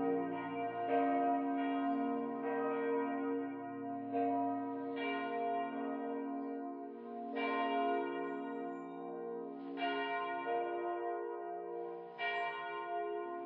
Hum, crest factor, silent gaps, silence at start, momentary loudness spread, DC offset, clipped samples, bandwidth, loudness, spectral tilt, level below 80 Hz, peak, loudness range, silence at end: none; 16 dB; none; 0 s; 9 LU; under 0.1%; under 0.1%; 5 kHz; -39 LUFS; -3 dB/octave; under -90 dBFS; -22 dBFS; 4 LU; 0 s